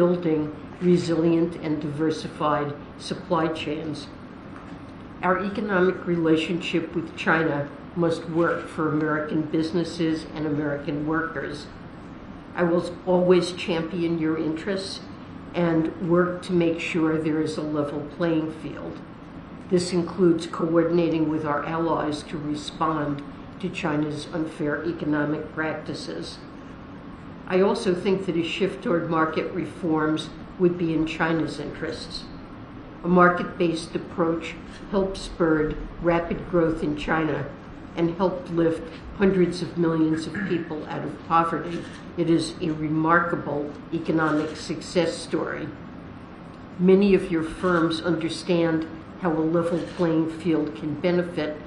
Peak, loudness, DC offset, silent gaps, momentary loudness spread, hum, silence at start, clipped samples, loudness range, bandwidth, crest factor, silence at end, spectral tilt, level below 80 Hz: -4 dBFS; -25 LUFS; under 0.1%; none; 15 LU; none; 0 s; under 0.1%; 4 LU; 11 kHz; 20 dB; 0 s; -6.5 dB/octave; -48 dBFS